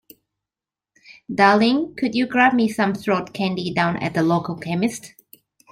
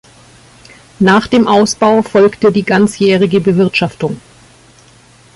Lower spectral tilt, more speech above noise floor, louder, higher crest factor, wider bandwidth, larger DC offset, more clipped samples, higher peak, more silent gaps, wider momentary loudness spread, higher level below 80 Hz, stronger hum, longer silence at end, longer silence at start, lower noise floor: about the same, -5.5 dB/octave vs -5.5 dB/octave; first, 70 dB vs 33 dB; second, -20 LUFS vs -11 LUFS; first, 20 dB vs 12 dB; first, 16 kHz vs 11.5 kHz; neither; neither; about the same, -2 dBFS vs 0 dBFS; neither; about the same, 9 LU vs 7 LU; second, -60 dBFS vs -48 dBFS; neither; second, 0.65 s vs 1.15 s; about the same, 1.1 s vs 1 s; first, -89 dBFS vs -43 dBFS